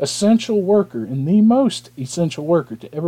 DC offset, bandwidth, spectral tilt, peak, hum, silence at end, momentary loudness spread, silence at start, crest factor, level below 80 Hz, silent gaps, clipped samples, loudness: under 0.1%; 12.5 kHz; -6 dB/octave; -4 dBFS; none; 0 s; 11 LU; 0 s; 12 dB; -62 dBFS; none; under 0.1%; -17 LUFS